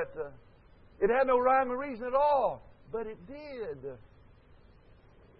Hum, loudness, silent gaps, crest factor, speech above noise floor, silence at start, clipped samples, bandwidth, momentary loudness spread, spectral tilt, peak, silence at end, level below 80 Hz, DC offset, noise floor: none; -30 LUFS; none; 18 dB; 28 dB; 0 s; under 0.1%; 5.4 kHz; 19 LU; -9 dB/octave; -14 dBFS; 1.4 s; -58 dBFS; under 0.1%; -58 dBFS